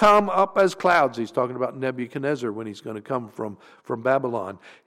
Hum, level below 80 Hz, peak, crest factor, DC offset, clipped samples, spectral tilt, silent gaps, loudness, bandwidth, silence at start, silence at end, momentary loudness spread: none; -60 dBFS; -6 dBFS; 16 dB; under 0.1%; under 0.1%; -5.5 dB/octave; none; -24 LUFS; 15.5 kHz; 0 s; 0.15 s; 15 LU